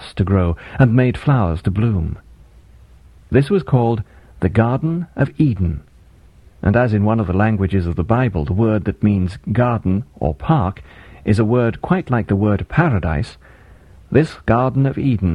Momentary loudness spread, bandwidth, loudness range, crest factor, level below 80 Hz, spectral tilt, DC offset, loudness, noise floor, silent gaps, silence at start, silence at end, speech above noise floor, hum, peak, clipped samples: 7 LU; 10.5 kHz; 2 LU; 16 dB; -34 dBFS; -9.5 dB/octave; under 0.1%; -18 LUFS; -46 dBFS; none; 0 s; 0 s; 30 dB; none; 0 dBFS; under 0.1%